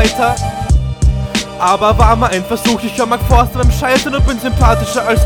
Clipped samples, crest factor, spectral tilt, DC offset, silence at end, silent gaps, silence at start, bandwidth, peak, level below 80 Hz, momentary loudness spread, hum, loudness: 0.4%; 12 dB; -5 dB/octave; 0.2%; 0 s; none; 0 s; 18.5 kHz; 0 dBFS; -16 dBFS; 5 LU; none; -13 LUFS